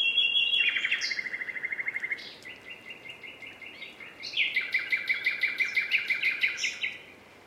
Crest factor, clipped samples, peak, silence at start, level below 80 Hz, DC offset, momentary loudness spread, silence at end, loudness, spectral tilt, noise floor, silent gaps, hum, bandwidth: 18 dB; under 0.1%; -12 dBFS; 0 s; -76 dBFS; under 0.1%; 20 LU; 0.05 s; -27 LUFS; 1 dB/octave; -51 dBFS; none; none; 16 kHz